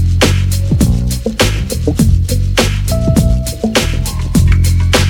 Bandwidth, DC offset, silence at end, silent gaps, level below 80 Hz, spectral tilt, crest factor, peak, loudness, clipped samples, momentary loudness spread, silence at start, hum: 18.5 kHz; under 0.1%; 0 s; none; -18 dBFS; -5 dB/octave; 12 dB; 0 dBFS; -13 LUFS; under 0.1%; 5 LU; 0 s; none